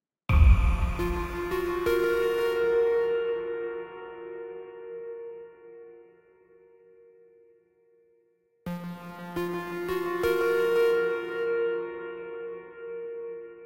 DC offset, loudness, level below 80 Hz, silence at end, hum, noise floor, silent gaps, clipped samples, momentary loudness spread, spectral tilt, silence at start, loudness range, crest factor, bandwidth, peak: under 0.1%; -28 LUFS; -32 dBFS; 0 s; none; -68 dBFS; none; under 0.1%; 17 LU; -7.5 dB/octave; 0.3 s; 19 LU; 22 dB; 16 kHz; -8 dBFS